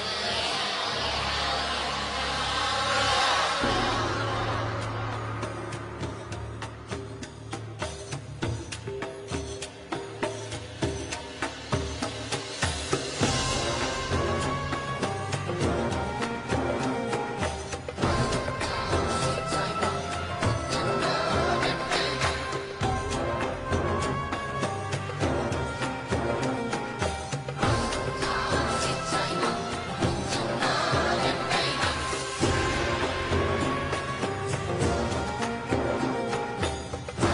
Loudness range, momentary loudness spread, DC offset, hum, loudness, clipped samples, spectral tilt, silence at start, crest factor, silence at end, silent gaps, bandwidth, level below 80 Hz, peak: 8 LU; 10 LU; under 0.1%; none; -28 LUFS; under 0.1%; -4 dB/octave; 0 s; 18 dB; 0 s; none; 11.5 kHz; -42 dBFS; -12 dBFS